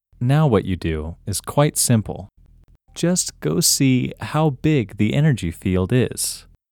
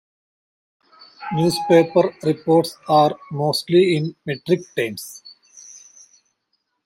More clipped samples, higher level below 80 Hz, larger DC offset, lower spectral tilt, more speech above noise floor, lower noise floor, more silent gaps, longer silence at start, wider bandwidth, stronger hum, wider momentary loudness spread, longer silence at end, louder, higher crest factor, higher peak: neither; first, -42 dBFS vs -64 dBFS; neither; about the same, -5 dB/octave vs -6 dB/octave; second, 32 dB vs 54 dB; second, -51 dBFS vs -73 dBFS; neither; second, 0.2 s vs 1.2 s; first, 19.5 kHz vs 16 kHz; neither; second, 10 LU vs 20 LU; second, 0.3 s vs 1.1 s; about the same, -19 LUFS vs -19 LUFS; about the same, 16 dB vs 18 dB; about the same, -4 dBFS vs -2 dBFS